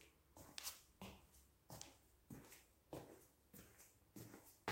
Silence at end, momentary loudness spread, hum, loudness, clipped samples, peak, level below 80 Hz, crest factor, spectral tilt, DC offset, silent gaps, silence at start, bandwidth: 0 s; 14 LU; none; -59 LUFS; under 0.1%; -28 dBFS; -76 dBFS; 32 dB; -3 dB/octave; under 0.1%; none; 0 s; 16 kHz